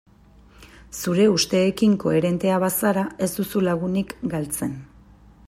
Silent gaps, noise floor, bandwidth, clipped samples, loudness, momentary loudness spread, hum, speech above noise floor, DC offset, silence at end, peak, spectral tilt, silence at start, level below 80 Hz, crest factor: none; -51 dBFS; 16 kHz; under 0.1%; -22 LUFS; 9 LU; none; 30 dB; under 0.1%; 0.6 s; -6 dBFS; -5 dB/octave; 0.6 s; -52 dBFS; 16 dB